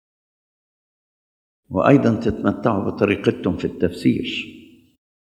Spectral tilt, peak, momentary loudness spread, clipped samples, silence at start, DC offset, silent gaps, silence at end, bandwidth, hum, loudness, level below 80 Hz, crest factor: -7.5 dB/octave; 0 dBFS; 11 LU; under 0.1%; 1.7 s; under 0.1%; none; 0.75 s; 12 kHz; none; -20 LUFS; -52 dBFS; 22 dB